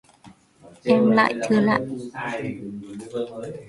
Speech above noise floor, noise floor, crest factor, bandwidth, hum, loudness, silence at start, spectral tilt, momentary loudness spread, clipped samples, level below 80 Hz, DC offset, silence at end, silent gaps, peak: 29 dB; -51 dBFS; 18 dB; 11.5 kHz; none; -22 LUFS; 0.25 s; -6.5 dB/octave; 16 LU; under 0.1%; -62 dBFS; under 0.1%; 0 s; none; -4 dBFS